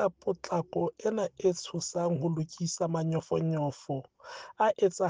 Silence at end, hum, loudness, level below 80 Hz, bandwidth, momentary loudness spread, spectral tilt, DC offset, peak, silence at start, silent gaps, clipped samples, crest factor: 0 s; none; -31 LUFS; -70 dBFS; 9.8 kHz; 9 LU; -6 dB/octave; under 0.1%; -14 dBFS; 0 s; none; under 0.1%; 16 dB